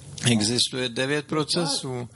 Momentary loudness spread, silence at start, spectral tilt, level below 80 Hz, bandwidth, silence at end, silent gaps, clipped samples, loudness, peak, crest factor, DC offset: 5 LU; 0 s; -3.5 dB/octave; -56 dBFS; 12 kHz; 0.1 s; none; under 0.1%; -24 LUFS; -6 dBFS; 18 dB; under 0.1%